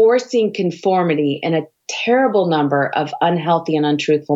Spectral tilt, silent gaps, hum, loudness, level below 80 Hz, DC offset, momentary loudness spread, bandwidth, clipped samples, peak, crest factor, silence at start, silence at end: -6 dB/octave; none; none; -17 LUFS; -70 dBFS; under 0.1%; 5 LU; 7.8 kHz; under 0.1%; -4 dBFS; 12 dB; 0 s; 0 s